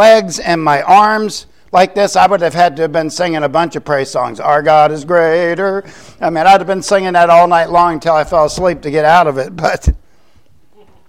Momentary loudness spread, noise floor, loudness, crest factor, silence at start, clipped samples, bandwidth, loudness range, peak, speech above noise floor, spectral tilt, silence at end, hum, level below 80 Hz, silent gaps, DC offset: 9 LU; -52 dBFS; -11 LUFS; 12 dB; 0 s; under 0.1%; 15.5 kHz; 3 LU; 0 dBFS; 41 dB; -4.5 dB/octave; 1.1 s; none; -30 dBFS; none; 0.7%